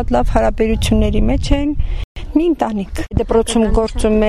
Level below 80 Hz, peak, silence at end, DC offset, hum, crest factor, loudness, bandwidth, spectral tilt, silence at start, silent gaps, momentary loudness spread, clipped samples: -20 dBFS; -2 dBFS; 0 s; under 0.1%; none; 12 dB; -17 LUFS; 13 kHz; -6 dB/octave; 0 s; 2.04-2.15 s; 7 LU; under 0.1%